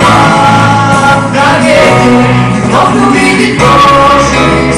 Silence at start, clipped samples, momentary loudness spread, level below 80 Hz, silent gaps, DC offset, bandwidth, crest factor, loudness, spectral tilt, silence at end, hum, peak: 0 s; 0.3%; 3 LU; -26 dBFS; none; under 0.1%; 15.5 kHz; 6 dB; -5 LUFS; -5 dB/octave; 0 s; none; 0 dBFS